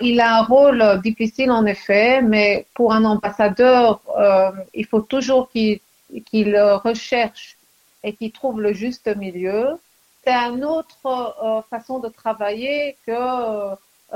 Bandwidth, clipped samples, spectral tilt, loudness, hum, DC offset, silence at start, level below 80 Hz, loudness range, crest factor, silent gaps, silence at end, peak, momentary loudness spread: 15.5 kHz; under 0.1%; -5.5 dB/octave; -18 LUFS; none; under 0.1%; 0 s; -54 dBFS; 8 LU; 16 dB; none; 0 s; -2 dBFS; 14 LU